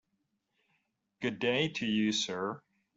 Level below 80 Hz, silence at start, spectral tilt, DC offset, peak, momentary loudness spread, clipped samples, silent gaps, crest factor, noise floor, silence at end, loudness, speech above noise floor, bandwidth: -72 dBFS; 1.2 s; -4 dB/octave; under 0.1%; -16 dBFS; 9 LU; under 0.1%; none; 18 dB; -81 dBFS; 0.4 s; -32 LUFS; 48 dB; 8 kHz